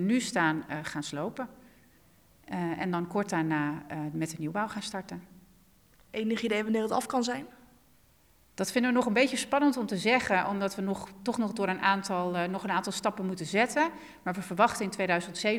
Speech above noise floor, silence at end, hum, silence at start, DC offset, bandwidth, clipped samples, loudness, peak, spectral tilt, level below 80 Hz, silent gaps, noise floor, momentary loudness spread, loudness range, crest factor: 34 dB; 0 s; none; 0 s; under 0.1%; over 20 kHz; under 0.1%; -30 LUFS; -10 dBFS; -4.5 dB/octave; -68 dBFS; none; -63 dBFS; 10 LU; 6 LU; 20 dB